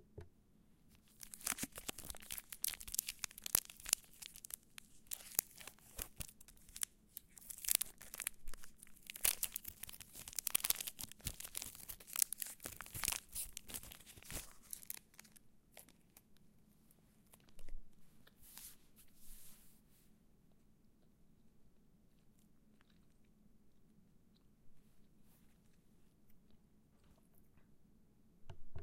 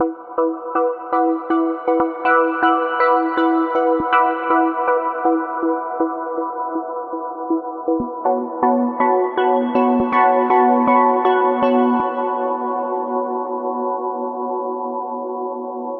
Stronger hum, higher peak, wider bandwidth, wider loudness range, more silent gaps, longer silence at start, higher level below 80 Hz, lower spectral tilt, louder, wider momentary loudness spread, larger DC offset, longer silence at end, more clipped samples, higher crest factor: neither; second, -8 dBFS vs -2 dBFS; first, 17 kHz vs 4.7 kHz; first, 20 LU vs 7 LU; neither; about the same, 0 s vs 0 s; about the same, -62 dBFS vs -60 dBFS; second, 0 dB/octave vs -8 dB/octave; second, -42 LUFS vs -19 LUFS; first, 24 LU vs 9 LU; neither; about the same, 0 s vs 0 s; neither; first, 40 dB vs 16 dB